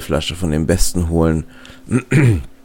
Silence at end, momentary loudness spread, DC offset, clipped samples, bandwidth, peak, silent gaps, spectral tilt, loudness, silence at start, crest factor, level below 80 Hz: 0.1 s; 7 LU; under 0.1%; under 0.1%; 17 kHz; 0 dBFS; none; -5.5 dB/octave; -17 LUFS; 0 s; 16 dB; -28 dBFS